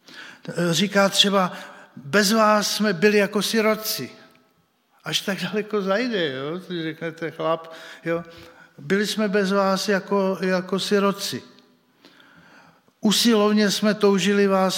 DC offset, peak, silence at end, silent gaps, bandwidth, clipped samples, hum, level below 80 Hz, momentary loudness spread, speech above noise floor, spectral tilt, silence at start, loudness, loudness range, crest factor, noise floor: under 0.1%; -4 dBFS; 0 s; none; 17 kHz; under 0.1%; none; -72 dBFS; 13 LU; 43 dB; -4 dB/octave; 0.1 s; -21 LUFS; 7 LU; 20 dB; -64 dBFS